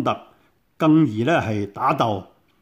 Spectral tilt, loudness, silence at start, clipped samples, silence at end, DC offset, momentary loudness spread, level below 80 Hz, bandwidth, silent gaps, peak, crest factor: -7.5 dB/octave; -21 LUFS; 0 s; under 0.1%; 0.4 s; under 0.1%; 10 LU; -60 dBFS; 8.4 kHz; none; -6 dBFS; 16 dB